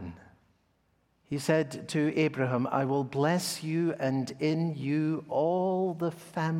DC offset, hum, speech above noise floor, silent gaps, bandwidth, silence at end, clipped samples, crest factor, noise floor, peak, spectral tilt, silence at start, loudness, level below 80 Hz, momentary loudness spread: under 0.1%; none; 42 dB; none; 16.5 kHz; 0 s; under 0.1%; 18 dB; -71 dBFS; -12 dBFS; -6 dB/octave; 0 s; -30 LUFS; -70 dBFS; 6 LU